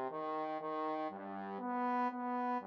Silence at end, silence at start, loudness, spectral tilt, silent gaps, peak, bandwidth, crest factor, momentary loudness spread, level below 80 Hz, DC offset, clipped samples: 0 s; 0 s; -39 LUFS; -4.5 dB/octave; none; -28 dBFS; 6.2 kHz; 12 dB; 7 LU; under -90 dBFS; under 0.1%; under 0.1%